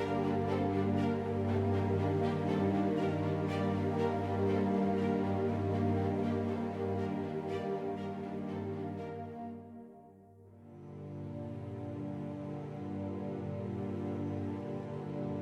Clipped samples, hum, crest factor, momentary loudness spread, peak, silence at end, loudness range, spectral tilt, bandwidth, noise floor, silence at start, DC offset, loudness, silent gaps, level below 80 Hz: under 0.1%; none; 14 dB; 11 LU; -20 dBFS; 0 s; 12 LU; -9 dB/octave; 9 kHz; -57 dBFS; 0 s; under 0.1%; -35 LUFS; none; -68 dBFS